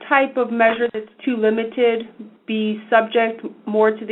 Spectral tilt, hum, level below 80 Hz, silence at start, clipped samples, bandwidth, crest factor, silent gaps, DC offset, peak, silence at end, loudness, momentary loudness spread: -7.5 dB/octave; none; -68 dBFS; 0 s; under 0.1%; 4.1 kHz; 18 dB; none; under 0.1%; 0 dBFS; 0 s; -19 LUFS; 10 LU